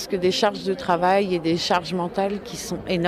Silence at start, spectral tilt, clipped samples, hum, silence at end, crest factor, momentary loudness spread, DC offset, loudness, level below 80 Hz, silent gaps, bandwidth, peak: 0 s; -5 dB/octave; under 0.1%; none; 0 s; 16 dB; 8 LU; under 0.1%; -23 LUFS; -52 dBFS; none; 15 kHz; -6 dBFS